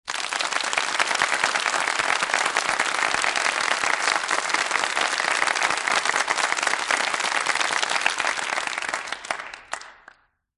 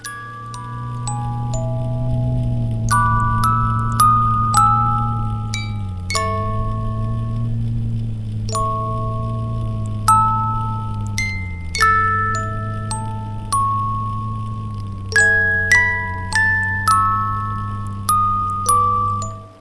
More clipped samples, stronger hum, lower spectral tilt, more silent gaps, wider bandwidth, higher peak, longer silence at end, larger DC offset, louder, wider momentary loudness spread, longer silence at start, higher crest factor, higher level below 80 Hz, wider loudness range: neither; neither; second, 1 dB/octave vs -4.5 dB/octave; neither; about the same, 12 kHz vs 11 kHz; second, -4 dBFS vs 0 dBFS; first, 0.65 s vs 0.05 s; neither; second, -22 LUFS vs -19 LUFS; second, 6 LU vs 12 LU; about the same, 0.05 s vs 0 s; about the same, 22 dB vs 18 dB; second, -66 dBFS vs -32 dBFS; second, 2 LU vs 6 LU